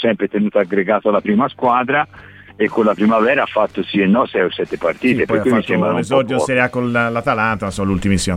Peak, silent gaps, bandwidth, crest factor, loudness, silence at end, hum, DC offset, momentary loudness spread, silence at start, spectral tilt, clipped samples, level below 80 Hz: -2 dBFS; none; 13 kHz; 14 dB; -16 LUFS; 0 s; none; under 0.1%; 5 LU; 0 s; -6 dB/octave; under 0.1%; -42 dBFS